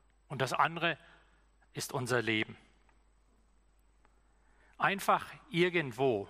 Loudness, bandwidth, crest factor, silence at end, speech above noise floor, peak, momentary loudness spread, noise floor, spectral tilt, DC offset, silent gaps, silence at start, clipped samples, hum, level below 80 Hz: -33 LUFS; 15 kHz; 20 dB; 0 s; 35 dB; -14 dBFS; 11 LU; -67 dBFS; -4.5 dB/octave; under 0.1%; none; 0.3 s; under 0.1%; none; -68 dBFS